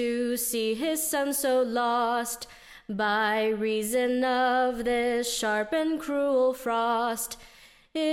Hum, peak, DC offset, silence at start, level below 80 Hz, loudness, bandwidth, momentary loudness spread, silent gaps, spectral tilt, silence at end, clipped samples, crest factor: none; -14 dBFS; under 0.1%; 0 s; -58 dBFS; -26 LUFS; 16.5 kHz; 9 LU; none; -2.5 dB/octave; 0 s; under 0.1%; 12 dB